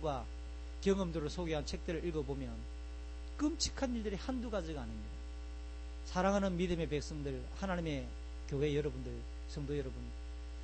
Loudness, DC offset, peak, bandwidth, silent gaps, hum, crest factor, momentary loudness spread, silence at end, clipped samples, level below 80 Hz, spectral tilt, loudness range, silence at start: -40 LUFS; under 0.1%; -20 dBFS; 8.4 kHz; none; 60 Hz at -45 dBFS; 20 dB; 13 LU; 0 s; under 0.1%; -46 dBFS; -5.5 dB/octave; 3 LU; 0 s